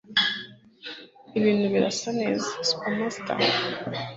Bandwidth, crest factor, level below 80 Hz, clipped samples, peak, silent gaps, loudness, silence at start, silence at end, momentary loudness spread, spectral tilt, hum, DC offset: 8 kHz; 20 dB; -66 dBFS; under 0.1%; -8 dBFS; none; -25 LUFS; 0.1 s; 0 s; 17 LU; -4 dB/octave; none; under 0.1%